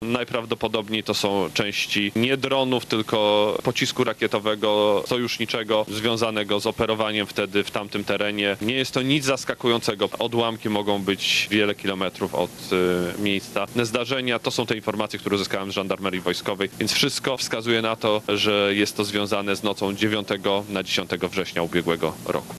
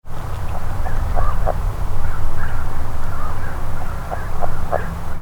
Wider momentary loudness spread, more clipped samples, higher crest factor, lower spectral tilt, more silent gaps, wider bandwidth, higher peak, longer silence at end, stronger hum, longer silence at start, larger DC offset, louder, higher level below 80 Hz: about the same, 5 LU vs 5 LU; neither; first, 18 dB vs 12 dB; second, -4 dB/octave vs -6.5 dB/octave; neither; first, 14 kHz vs 3.6 kHz; second, -6 dBFS vs -2 dBFS; about the same, 0 s vs 0 s; neither; about the same, 0 s vs 0.05 s; neither; first, -23 LUFS vs -26 LUFS; second, -58 dBFS vs -20 dBFS